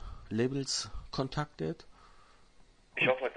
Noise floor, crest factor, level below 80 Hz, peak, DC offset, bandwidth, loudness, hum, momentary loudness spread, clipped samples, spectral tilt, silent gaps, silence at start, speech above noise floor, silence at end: -60 dBFS; 22 dB; -52 dBFS; -14 dBFS; under 0.1%; 10.5 kHz; -34 LUFS; none; 10 LU; under 0.1%; -4 dB/octave; none; 0 s; 27 dB; 0 s